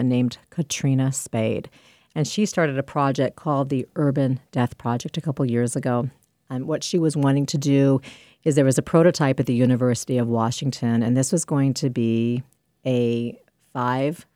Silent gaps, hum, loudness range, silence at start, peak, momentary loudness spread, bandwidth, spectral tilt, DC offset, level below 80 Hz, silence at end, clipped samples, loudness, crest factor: none; none; 4 LU; 0 s; -4 dBFS; 8 LU; 15.5 kHz; -6 dB/octave; under 0.1%; -60 dBFS; 0.15 s; under 0.1%; -22 LUFS; 18 dB